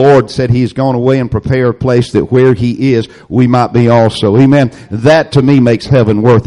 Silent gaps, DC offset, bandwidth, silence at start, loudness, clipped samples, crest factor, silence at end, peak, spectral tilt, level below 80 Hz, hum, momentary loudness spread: none; under 0.1%; 11 kHz; 0 s; -10 LUFS; under 0.1%; 8 dB; 0.05 s; 0 dBFS; -8 dB/octave; -36 dBFS; none; 5 LU